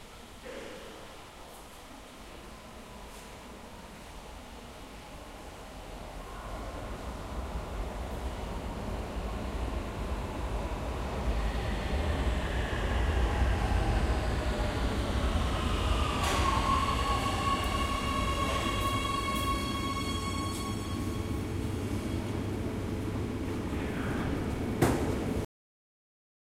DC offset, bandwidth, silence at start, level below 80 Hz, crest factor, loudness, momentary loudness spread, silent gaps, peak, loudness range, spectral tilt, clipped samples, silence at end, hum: under 0.1%; 16 kHz; 0 s; -36 dBFS; 22 dB; -33 LUFS; 17 LU; none; -12 dBFS; 17 LU; -5.5 dB/octave; under 0.1%; 1.1 s; none